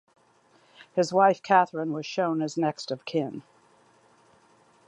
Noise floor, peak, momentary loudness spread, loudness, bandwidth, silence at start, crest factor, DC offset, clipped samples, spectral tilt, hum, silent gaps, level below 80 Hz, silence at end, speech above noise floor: -62 dBFS; -6 dBFS; 11 LU; -26 LUFS; 10.5 kHz; 0.95 s; 22 dB; under 0.1%; under 0.1%; -5.5 dB/octave; none; none; -78 dBFS; 1.45 s; 37 dB